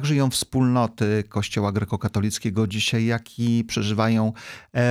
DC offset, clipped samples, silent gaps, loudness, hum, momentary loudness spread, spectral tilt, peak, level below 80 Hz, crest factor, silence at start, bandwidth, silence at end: under 0.1%; under 0.1%; none; -23 LUFS; none; 5 LU; -5.5 dB/octave; -8 dBFS; -52 dBFS; 14 dB; 0 s; 15.5 kHz; 0 s